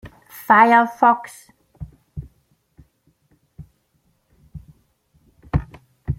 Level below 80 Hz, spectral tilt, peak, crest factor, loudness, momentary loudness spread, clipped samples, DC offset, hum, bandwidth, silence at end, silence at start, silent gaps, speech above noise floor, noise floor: -42 dBFS; -6.5 dB/octave; 0 dBFS; 22 dB; -16 LUFS; 28 LU; under 0.1%; under 0.1%; none; 16.5 kHz; 0.05 s; 0.05 s; none; 50 dB; -65 dBFS